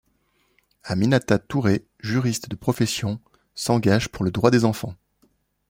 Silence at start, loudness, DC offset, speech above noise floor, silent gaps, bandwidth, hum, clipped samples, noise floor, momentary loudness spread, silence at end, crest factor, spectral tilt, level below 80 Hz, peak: 0.85 s; -22 LUFS; under 0.1%; 45 dB; none; 16.5 kHz; none; under 0.1%; -66 dBFS; 12 LU; 0.75 s; 20 dB; -6 dB/octave; -52 dBFS; -2 dBFS